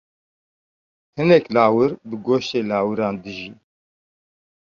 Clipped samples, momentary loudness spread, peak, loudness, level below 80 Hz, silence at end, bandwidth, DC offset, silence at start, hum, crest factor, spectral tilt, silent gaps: under 0.1%; 17 LU; -2 dBFS; -19 LUFS; -60 dBFS; 1.15 s; 7.2 kHz; under 0.1%; 1.15 s; none; 20 dB; -7 dB/octave; none